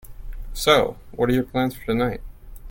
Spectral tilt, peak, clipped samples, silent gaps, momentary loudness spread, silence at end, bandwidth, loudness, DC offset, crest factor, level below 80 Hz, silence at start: -5 dB/octave; 0 dBFS; under 0.1%; none; 19 LU; 0 s; 17 kHz; -22 LUFS; under 0.1%; 22 dB; -36 dBFS; 0.05 s